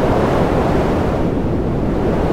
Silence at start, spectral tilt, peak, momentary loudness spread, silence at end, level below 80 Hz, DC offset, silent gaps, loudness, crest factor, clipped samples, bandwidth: 0 s; -8 dB/octave; -2 dBFS; 3 LU; 0 s; -24 dBFS; under 0.1%; none; -17 LUFS; 12 dB; under 0.1%; 16 kHz